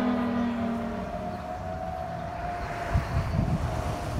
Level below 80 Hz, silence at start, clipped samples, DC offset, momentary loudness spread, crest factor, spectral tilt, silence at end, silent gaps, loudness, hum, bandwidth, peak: -38 dBFS; 0 s; under 0.1%; under 0.1%; 7 LU; 16 dB; -7.5 dB/octave; 0 s; none; -31 LUFS; none; 15.5 kHz; -14 dBFS